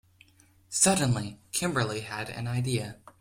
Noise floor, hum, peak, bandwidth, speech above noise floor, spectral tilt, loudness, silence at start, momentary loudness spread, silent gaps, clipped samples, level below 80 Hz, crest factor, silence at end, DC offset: -60 dBFS; none; -8 dBFS; 16.5 kHz; 32 dB; -4 dB/octave; -28 LUFS; 0.7 s; 12 LU; none; under 0.1%; -60 dBFS; 22 dB; 0.1 s; under 0.1%